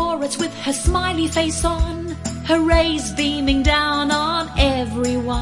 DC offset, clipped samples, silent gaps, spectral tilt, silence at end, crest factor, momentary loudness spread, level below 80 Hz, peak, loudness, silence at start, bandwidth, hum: under 0.1%; under 0.1%; none; -4.5 dB/octave; 0 s; 18 dB; 7 LU; -28 dBFS; -2 dBFS; -19 LUFS; 0 s; 11.5 kHz; none